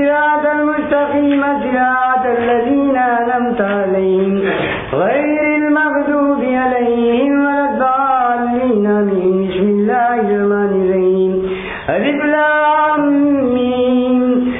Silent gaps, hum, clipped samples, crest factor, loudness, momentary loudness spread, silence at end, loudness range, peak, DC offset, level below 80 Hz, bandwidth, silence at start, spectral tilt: none; none; under 0.1%; 12 dB; -14 LUFS; 3 LU; 0 s; 1 LU; -2 dBFS; under 0.1%; -46 dBFS; 3.9 kHz; 0 s; -10.5 dB/octave